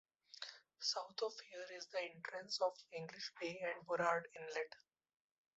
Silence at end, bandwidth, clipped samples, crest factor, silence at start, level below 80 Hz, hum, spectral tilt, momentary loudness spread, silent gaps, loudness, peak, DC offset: 0.8 s; 8 kHz; under 0.1%; 24 dB; 0.35 s; under -90 dBFS; none; -0.5 dB/octave; 13 LU; none; -44 LUFS; -22 dBFS; under 0.1%